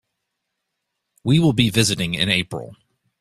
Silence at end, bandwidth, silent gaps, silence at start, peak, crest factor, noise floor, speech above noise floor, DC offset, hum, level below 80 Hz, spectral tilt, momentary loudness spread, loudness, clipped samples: 0.45 s; 14.5 kHz; none; 1.25 s; -2 dBFS; 20 dB; -78 dBFS; 59 dB; under 0.1%; none; -50 dBFS; -4.5 dB/octave; 13 LU; -18 LUFS; under 0.1%